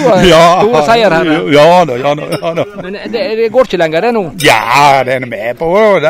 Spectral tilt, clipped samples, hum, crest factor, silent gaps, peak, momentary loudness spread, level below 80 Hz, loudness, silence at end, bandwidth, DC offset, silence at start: -5 dB/octave; 2%; none; 8 dB; none; 0 dBFS; 11 LU; -36 dBFS; -9 LUFS; 0 s; 16.5 kHz; under 0.1%; 0 s